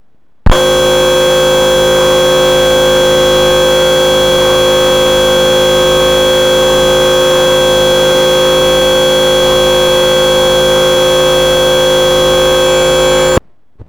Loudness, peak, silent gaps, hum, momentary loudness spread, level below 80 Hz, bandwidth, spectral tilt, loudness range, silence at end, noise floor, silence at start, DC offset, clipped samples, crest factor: -8 LUFS; 0 dBFS; none; none; 0 LU; -24 dBFS; over 20 kHz; -3 dB/octave; 0 LU; 0.05 s; -38 dBFS; 0.45 s; under 0.1%; under 0.1%; 8 dB